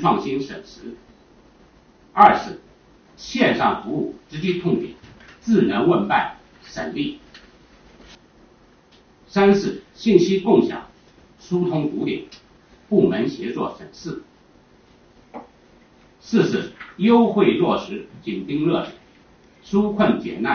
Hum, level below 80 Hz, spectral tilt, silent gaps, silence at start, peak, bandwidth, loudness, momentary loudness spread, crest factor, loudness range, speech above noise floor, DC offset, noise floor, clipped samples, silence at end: none; -54 dBFS; -5 dB/octave; none; 0 s; 0 dBFS; 6.6 kHz; -20 LUFS; 19 LU; 22 dB; 6 LU; 33 dB; under 0.1%; -53 dBFS; under 0.1%; 0 s